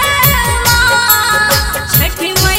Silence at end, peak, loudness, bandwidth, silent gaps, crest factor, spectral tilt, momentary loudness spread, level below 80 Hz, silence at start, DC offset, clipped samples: 0 s; 0 dBFS; -10 LUFS; over 20 kHz; none; 12 dB; -2.5 dB/octave; 3 LU; -22 dBFS; 0 s; under 0.1%; 0.2%